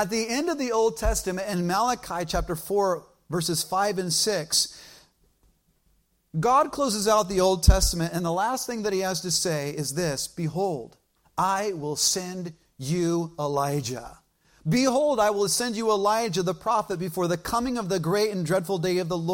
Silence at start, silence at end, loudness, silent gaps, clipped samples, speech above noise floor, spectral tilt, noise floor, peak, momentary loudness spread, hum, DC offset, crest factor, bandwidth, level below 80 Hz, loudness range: 0 s; 0 s; -25 LUFS; none; under 0.1%; 42 dB; -4 dB/octave; -67 dBFS; -2 dBFS; 8 LU; none; under 0.1%; 22 dB; 16.5 kHz; -36 dBFS; 4 LU